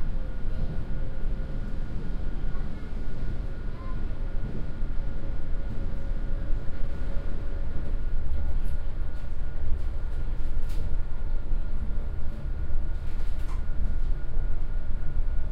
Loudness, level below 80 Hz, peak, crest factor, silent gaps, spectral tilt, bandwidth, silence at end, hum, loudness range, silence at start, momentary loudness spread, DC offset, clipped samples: -36 LUFS; -28 dBFS; -10 dBFS; 12 dB; none; -8 dB/octave; 2.7 kHz; 0 s; none; 2 LU; 0 s; 3 LU; under 0.1%; under 0.1%